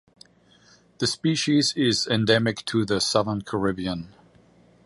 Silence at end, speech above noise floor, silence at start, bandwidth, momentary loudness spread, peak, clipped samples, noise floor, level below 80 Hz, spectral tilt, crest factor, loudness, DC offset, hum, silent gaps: 0.8 s; 34 dB; 1 s; 11.5 kHz; 9 LU; -4 dBFS; under 0.1%; -57 dBFS; -54 dBFS; -4.5 dB/octave; 22 dB; -23 LUFS; under 0.1%; none; none